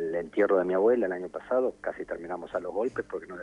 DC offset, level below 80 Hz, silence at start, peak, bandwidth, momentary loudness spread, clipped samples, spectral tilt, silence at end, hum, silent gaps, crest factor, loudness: under 0.1%; -62 dBFS; 0 s; -12 dBFS; 10 kHz; 12 LU; under 0.1%; -7.5 dB/octave; 0 s; none; none; 16 dB; -29 LUFS